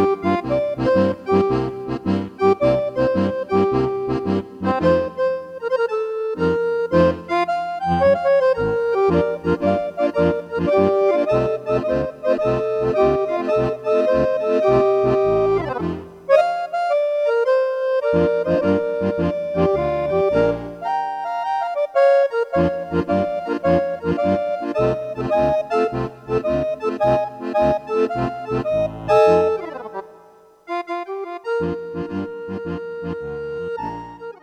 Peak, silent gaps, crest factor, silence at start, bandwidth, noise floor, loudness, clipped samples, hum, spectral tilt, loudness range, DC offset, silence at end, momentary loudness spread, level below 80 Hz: -2 dBFS; none; 18 dB; 0 s; 10 kHz; -49 dBFS; -20 LUFS; under 0.1%; none; -8 dB/octave; 3 LU; under 0.1%; 0.1 s; 10 LU; -44 dBFS